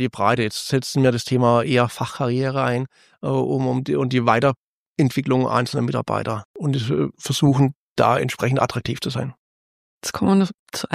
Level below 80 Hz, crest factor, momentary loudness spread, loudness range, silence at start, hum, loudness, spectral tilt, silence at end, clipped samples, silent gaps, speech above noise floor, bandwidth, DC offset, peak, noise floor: -56 dBFS; 18 dB; 9 LU; 1 LU; 0 s; none; -21 LUFS; -6 dB/octave; 0 s; under 0.1%; 4.57-4.95 s, 6.45-6.54 s, 7.76-7.96 s, 9.38-10.01 s, 10.54-10.66 s; over 70 dB; 15.5 kHz; under 0.1%; -2 dBFS; under -90 dBFS